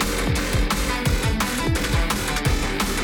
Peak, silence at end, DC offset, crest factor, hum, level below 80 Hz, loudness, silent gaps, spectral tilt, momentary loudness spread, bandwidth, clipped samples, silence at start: -8 dBFS; 0 s; under 0.1%; 12 dB; none; -26 dBFS; -22 LUFS; none; -4 dB/octave; 1 LU; 19 kHz; under 0.1%; 0 s